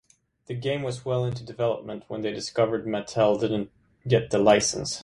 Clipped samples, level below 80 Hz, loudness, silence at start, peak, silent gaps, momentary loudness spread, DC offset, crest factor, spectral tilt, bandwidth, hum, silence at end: under 0.1%; -56 dBFS; -25 LUFS; 0.5 s; -4 dBFS; none; 13 LU; under 0.1%; 22 dB; -5 dB/octave; 11.5 kHz; none; 0 s